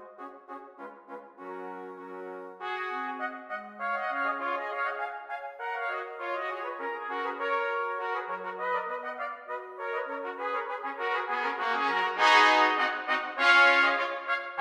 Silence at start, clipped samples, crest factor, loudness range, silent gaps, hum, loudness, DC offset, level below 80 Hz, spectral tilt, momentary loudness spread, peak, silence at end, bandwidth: 0 s; under 0.1%; 22 dB; 13 LU; none; none; -28 LUFS; under 0.1%; -84 dBFS; -1.5 dB/octave; 21 LU; -8 dBFS; 0 s; 14.5 kHz